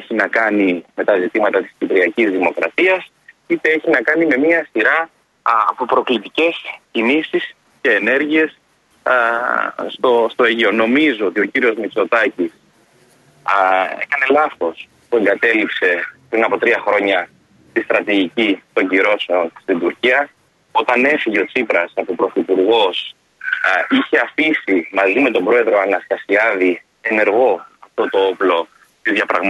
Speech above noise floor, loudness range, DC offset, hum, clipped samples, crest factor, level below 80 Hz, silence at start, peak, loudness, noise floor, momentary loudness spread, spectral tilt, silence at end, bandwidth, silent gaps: 37 dB; 2 LU; under 0.1%; none; under 0.1%; 16 dB; -66 dBFS; 0 s; -2 dBFS; -16 LUFS; -53 dBFS; 8 LU; -5 dB/octave; 0 s; 11 kHz; none